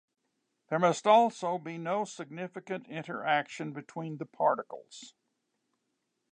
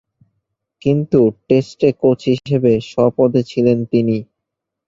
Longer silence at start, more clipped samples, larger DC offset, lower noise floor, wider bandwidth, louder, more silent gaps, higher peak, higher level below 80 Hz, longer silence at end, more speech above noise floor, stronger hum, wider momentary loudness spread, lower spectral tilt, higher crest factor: second, 0.7 s vs 0.85 s; neither; neither; about the same, -81 dBFS vs -80 dBFS; first, 9.6 kHz vs 7.6 kHz; second, -31 LUFS vs -16 LUFS; neither; second, -12 dBFS vs -2 dBFS; second, -86 dBFS vs -52 dBFS; first, 1.25 s vs 0.65 s; second, 51 dB vs 65 dB; neither; first, 17 LU vs 4 LU; second, -5 dB/octave vs -8.5 dB/octave; first, 22 dB vs 16 dB